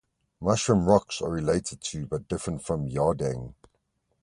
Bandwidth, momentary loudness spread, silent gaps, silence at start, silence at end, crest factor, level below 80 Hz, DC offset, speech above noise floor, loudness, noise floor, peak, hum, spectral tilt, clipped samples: 11.5 kHz; 11 LU; none; 0.4 s; 0.7 s; 22 dB; -48 dBFS; under 0.1%; 48 dB; -27 LUFS; -74 dBFS; -6 dBFS; none; -5.5 dB/octave; under 0.1%